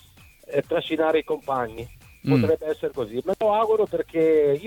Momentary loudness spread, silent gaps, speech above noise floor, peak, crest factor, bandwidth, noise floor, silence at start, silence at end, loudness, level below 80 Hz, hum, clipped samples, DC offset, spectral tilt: 8 LU; none; 26 dB; -8 dBFS; 16 dB; 17.5 kHz; -49 dBFS; 0.5 s; 0 s; -23 LUFS; -54 dBFS; none; under 0.1%; under 0.1%; -7.5 dB/octave